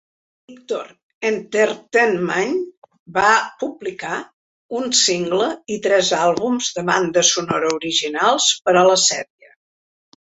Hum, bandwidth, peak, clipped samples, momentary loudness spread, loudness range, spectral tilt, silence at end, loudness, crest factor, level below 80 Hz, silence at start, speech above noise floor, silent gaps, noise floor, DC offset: none; 8.4 kHz; 0 dBFS; under 0.1%; 13 LU; 3 LU; -2 dB/octave; 1 s; -18 LUFS; 18 dB; -62 dBFS; 0.5 s; over 72 dB; 1.03-1.21 s, 2.77-2.82 s, 2.99-3.06 s, 4.33-4.69 s; under -90 dBFS; under 0.1%